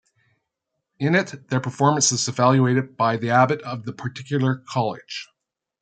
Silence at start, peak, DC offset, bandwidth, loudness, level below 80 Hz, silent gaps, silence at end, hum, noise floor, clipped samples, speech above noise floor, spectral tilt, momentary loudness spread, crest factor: 1 s; -2 dBFS; under 0.1%; 9.2 kHz; -21 LUFS; -66 dBFS; none; 0.6 s; none; -80 dBFS; under 0.1%; 59 dB; -4.5 dB/octave; 14 LU; 20 dB